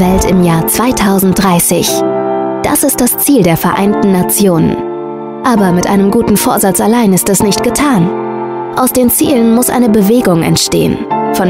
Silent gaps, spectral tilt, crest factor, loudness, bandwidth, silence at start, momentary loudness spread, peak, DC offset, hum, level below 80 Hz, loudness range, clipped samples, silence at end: none; -5 dB/octave; 10 dB; -10 LUFS; 16.5 kHz; 0 s; 6 LU; 0 dBFS; 0.3%; none; -32 dBFS; 1 LU; under 0.1%; 0 s